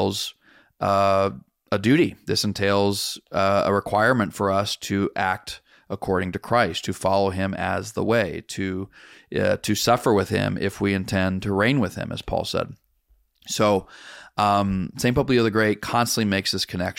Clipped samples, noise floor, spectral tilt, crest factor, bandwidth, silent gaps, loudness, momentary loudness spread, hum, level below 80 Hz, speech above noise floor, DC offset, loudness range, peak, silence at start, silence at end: under 0.1%; -63 dBFS; -5 dB/octave; 16 dB; 16.5 kHz; none; -23 LUFS; 10 LU; none; -50 dBFS; 40 dB; under 0.1%; 3 LU; -6 dBFS; 0 s; 0.05 s